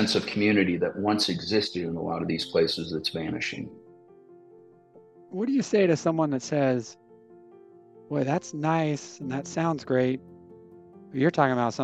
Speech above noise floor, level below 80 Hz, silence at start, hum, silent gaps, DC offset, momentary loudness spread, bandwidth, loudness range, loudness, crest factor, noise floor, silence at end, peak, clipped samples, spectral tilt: 28 dB; -68 dBFS; 0 s; none; none; under 0.1%; 10 LU; 12.5 kHz; 4 LU; -26 LUFS; 22 dB; -54 dBFS; 0 s; -6 dBFS; under 0.1%; -5.5 dB/octave